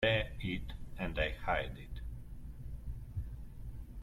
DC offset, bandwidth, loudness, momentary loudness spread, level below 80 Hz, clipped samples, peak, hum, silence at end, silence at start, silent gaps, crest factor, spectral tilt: under 0.1%; 15.5 kHz; -40 LUFS; 15 LU; -46 dBFS; under 0.1%; -20 dBFS; none; 0 s; 0 s; none; 20 dB; -6.5 dB/octave